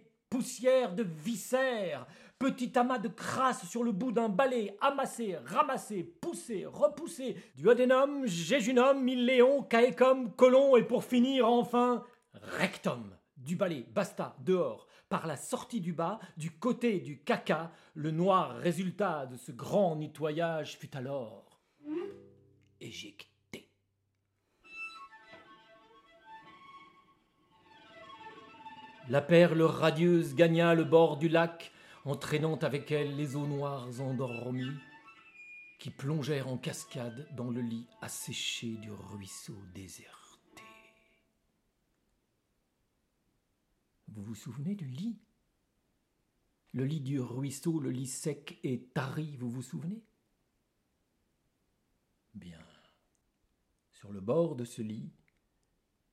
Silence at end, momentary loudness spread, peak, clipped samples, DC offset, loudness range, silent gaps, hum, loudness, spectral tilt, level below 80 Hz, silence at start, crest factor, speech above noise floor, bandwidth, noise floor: 1.05 s; 22 LU; -10 dBFS; under 0.1%; under 0.1%; 20 LU; none; none; -31 LUFS; -6 dB/octave; -78 dBFS; 0.3 s; 22 dB; 48 dB; 14.5 kHz; -79 dBFS